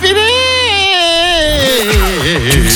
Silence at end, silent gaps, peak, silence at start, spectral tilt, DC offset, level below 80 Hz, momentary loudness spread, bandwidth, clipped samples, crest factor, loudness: 0 s; none; 0 dBFS; 0 s; -3 dB/octave; under 0.1%; -20 dBFS; 3 LU; 19.5 kHz; under 0.1%; 10 dB; -9 LUFS